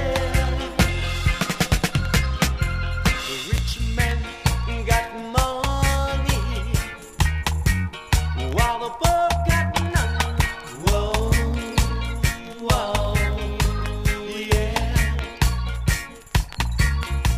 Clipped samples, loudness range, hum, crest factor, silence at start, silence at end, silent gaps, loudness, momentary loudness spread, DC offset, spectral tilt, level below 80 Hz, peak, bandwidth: under 0.1%; 2 LU; none; 20 dB; 0 s; 0 s; none; -23 LUFS; 4 LU; under 0.1%; -4.5 dB/octave; -26 dBFS; -2 dBFS; 15.5 kHz